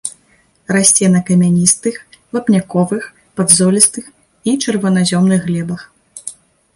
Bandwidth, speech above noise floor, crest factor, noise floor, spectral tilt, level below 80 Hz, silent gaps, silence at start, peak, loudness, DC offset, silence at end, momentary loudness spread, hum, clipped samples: 16 kHz; 41 dB; 14 dB; -54 dBFS; -4.5 dB/octave; -54 dBFS; none; 0.05 s; 0 dBFS; -13 LUFS; under 0.1%; 0.45 s; 19 LU; none; under 0.1%